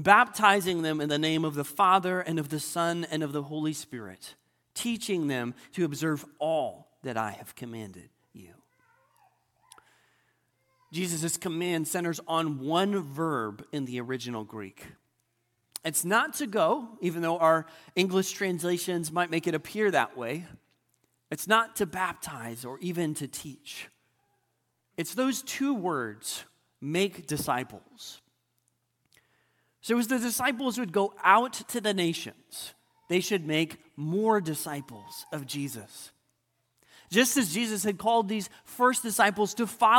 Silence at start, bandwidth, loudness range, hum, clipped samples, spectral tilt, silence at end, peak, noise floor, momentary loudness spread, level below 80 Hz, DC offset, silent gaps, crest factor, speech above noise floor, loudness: 0 s; 17.5 kHz; 8 LU; none; under 0.1%; -4 dB/octave; 0 s; -4 dBFS; -77 dBFS; 17 LU; -72 dBFS; under 0.1%; none; 26 dB; 48 dB; -28 LUFS